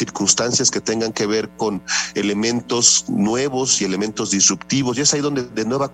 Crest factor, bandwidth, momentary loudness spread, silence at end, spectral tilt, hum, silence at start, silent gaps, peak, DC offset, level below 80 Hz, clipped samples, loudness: 20 dB; 12 kHz; 8 LU; 0 s; -2.5 dB/octave; none; 0 s; none; 0 dBFS; under 0.1%; -54 dBFS; under 0.1%; -18 LUFS